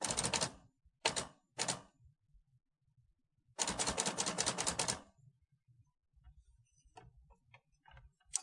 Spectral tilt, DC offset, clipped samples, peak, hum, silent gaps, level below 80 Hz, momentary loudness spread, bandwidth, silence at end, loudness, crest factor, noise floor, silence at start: -1.5 dB/octave; under 0.1%; under 0.1%; -14 dBFS; none; none; -64 dBFS; 9 LU; 11.5 kHz; 0 s; -37 LUFS; 30 dB; -76 dBFS; 0 s